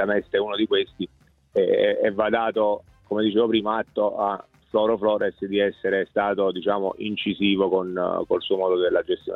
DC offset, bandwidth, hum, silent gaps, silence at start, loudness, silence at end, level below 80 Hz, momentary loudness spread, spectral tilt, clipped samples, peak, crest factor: under 0.1%; 4.2 kHz; none; none; 0 s; -23 LUFS; 0 s; -60 dBFS; 6 LU; -8 dB/octave; under 0.1%; -8 dBFS; 14 dB